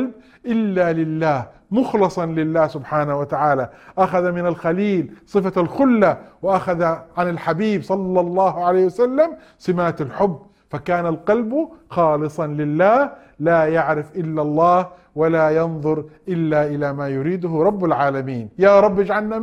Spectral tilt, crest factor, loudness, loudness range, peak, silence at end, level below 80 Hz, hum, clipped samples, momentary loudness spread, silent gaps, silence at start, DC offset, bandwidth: -8.5 dB/octave; 16 dB; -19 LUFS; 2 LU; -2 dBFS; 0 s; -54 dBFS; none; under 0.1%; 8 LU; none; 0 s; under 0.1%; 10 kHz